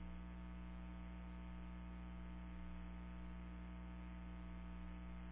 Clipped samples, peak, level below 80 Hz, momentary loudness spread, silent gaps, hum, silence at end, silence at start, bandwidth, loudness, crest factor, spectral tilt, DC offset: under 0.1%; -42 dBFS; -54 dBFS; 0 LU; none; 60 Hz at -50 dBFS; 0 s; 0 s; 3.9 kHz; -54 LUFS; 8 dB; -7 dB/octave; under 0.1%